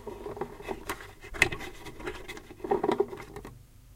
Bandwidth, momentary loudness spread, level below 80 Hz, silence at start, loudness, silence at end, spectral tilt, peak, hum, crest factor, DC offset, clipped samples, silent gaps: 16.5 kHz; 17 LU; -50 dBFS; 0 s; -33 LUFS; 0 s; -4 dB/octave; -4 dBFS; none; 30 dB; under 0.1%; under 0.1%; none